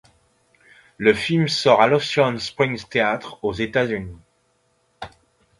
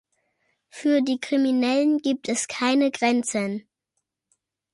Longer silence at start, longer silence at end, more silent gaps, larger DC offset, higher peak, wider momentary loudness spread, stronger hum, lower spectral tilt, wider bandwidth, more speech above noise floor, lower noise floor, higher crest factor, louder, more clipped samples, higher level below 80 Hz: first, 1 s vs 0.75 s; second, 0.5 s vs 1.15 s; neither; neither; first, 0 dBFS vs -10 dBFS; first, 23 LU vs 7 LU; neither; first, -5 dB/octave vs -3.5 dB/octave; about the same, 11.5 kHz vs 11.5 kHz; second, 45 dB vs 57 dB; second, -65 dBFS vs -80 dBFS; first, 22 dB vs 14 dB; first, -20 LUFS vs -23 LUFS; neither; first, -52 dBFS vs -74 dBFS